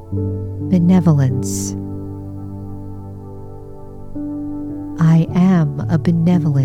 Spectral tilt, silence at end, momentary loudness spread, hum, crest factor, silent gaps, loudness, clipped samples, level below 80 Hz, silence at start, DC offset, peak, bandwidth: -7.5 dB/octave; 0 s; 20 LU; none; 14 dB; none; -17 LUFS; under 0.1%; -40 dBFS; 0 s; 0.1%; -4 dBFS; 13.5 kHz